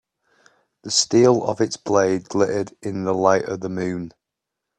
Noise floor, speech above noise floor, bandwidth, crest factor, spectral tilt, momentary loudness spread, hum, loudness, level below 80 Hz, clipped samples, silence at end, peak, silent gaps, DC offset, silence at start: -83 dBFS; 63 dB; 10 kHz; 20 dB; -4 dB/octave; 12 LU; none; -20 LUFS; -62 dBFS; under 0.1%; 0.7 s; 0 dBFS; none; under 0.1%; 0.85 s